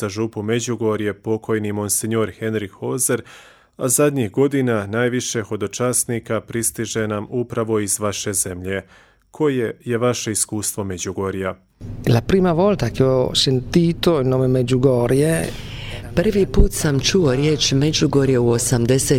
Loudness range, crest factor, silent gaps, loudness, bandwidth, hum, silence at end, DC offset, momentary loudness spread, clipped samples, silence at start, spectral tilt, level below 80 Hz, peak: 5 LU; 16 dB; none; -19 LUFS; 17.5 kHz; none; 0 s; under 0.1%; 9 LU; under 0.1%; 0 s; -4.5 dB/octave; -34 dBFS; -2 dBFS